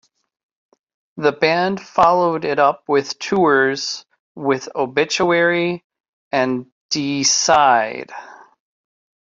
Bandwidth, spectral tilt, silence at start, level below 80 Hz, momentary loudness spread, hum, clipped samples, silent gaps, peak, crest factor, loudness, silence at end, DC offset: 8 kHz; -3 dB/octave; 1.15 s; -60 dBFS; 12 LU; none; under 0.1%; 4.20-4.35 s, 5.84-5.90 s, 6.00-6.31 s, 6.72-6.89 s; -2 dBFS; 18 dB; -17 LUFS; 0.95 s; under 0.1%